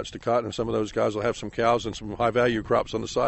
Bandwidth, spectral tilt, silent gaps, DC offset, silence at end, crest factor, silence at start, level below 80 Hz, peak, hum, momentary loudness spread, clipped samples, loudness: 8.2 kHz; -5.5 dB/octave; none; under 0.1%; 0 s; 16 dB; 0 s; -48 dBFS; -8 dBFS; none; 5 LU; under 0.1%; -26 LUFS